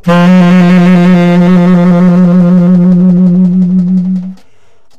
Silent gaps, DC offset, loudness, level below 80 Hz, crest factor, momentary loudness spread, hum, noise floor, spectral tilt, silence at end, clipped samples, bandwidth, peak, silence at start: none; under 0.1%; -6 LUFS; -40 dBFS; 6 dB; 5 LU; none; -50 dBFS; -9 dB/octave; 0 s; under 0.1%; 6.8 kHz; 0 dBFS; 0.05 s